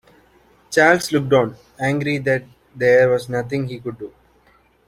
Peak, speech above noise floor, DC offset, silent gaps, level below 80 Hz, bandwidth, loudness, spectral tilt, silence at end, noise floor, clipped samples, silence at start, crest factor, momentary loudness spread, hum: -2 dBFS; 38 dB; under 0.1%; none; -54 dBFS; 15.5 kHz; -18 LUFS; -5.5 dB/octave; 0.8 s; -56 dBFS; under 0.1%; 0.7 s; 18 dB; 15 LU; none